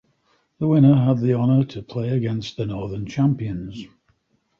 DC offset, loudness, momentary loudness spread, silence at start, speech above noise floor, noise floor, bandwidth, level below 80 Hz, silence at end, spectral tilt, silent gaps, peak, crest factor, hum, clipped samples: under 0.1%; -21 LUFS; 14 LU; 0.6 s; 46 dB; -66 dBFS; 7 kHz; -50 dBFS; 0.75 s; -9 dB/octave; none; -4 dBFS; 18 dB; none; under 0.1%